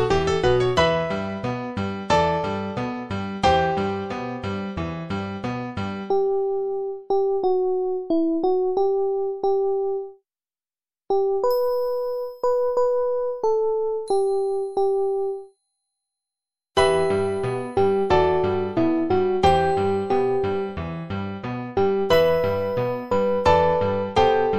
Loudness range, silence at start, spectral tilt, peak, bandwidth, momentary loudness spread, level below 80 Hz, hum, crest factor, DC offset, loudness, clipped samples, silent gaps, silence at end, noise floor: 4 LU; 0 s; -6.5 dB/octave; -4 dBFS; 13 kHz; 10 LU; -46 dBFS; none; 18 dB; under 0.1%; -23 LUFS; under 0.1%; none; 0 s; under -90 dBFS